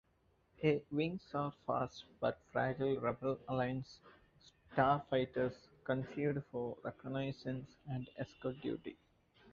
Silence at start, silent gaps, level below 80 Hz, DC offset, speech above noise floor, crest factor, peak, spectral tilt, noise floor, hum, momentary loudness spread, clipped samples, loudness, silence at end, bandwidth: 0.6 s; none; -68 dBFS; under 0.1%; 36 dB; 22 dB; -16 dBFS; -5.5 dB/octave; -75 dBFS; none; 10 LU; under 0.1%; -39 LUFS; 0 s; 7.2 kHz